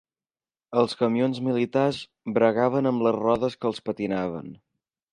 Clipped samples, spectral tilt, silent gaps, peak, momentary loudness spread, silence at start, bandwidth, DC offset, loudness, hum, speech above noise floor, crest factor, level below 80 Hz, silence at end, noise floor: under 0.1%; -7 dB/octave; none; -6 dBFS; 8 LU; 0.7 s; 11 kHz; under 0.1%; -25 LUFS; none; over 66 dB; 18 dB; -62 dBFS; 0.55 s; under -90 dBFS